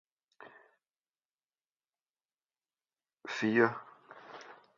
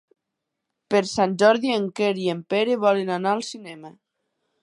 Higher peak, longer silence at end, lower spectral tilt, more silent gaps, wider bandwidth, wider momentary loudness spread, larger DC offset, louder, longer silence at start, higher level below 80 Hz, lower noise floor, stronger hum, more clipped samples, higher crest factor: second, -12 dBFS vs -4 dBFS; second, 0.25 s vs 0.7 s; about the same, -4 dB/octave vs -5 dB/octave; first, 1.25-1.29 s vs none; second, 7.2 kHz vs 11.5 kHz; first, 25 LU vs 15 LU; neither; second, -31 LUFS vs -22 LUFS; second, 0.4 s vs 0.9 s; second, -86 dBFS vs -68 dBFS; first, under -90 dBFS vs -82 dBFS; neither; neither; first, 28 dB vs 20 dB